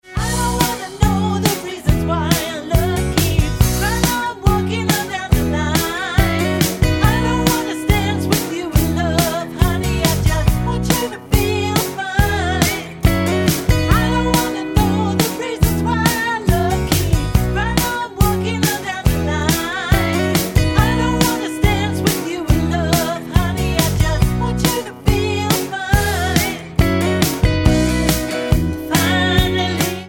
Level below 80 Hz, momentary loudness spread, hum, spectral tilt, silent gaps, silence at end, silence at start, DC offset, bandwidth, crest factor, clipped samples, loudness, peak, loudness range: -24 dBFS; 3 LU; none; -5 dB/octave; none; 0 s; 0.05 s; under 0.1%; over 20 kHz; 16 dB; under 0.1%; -17 LUFS; 0 dBFS; 1 LU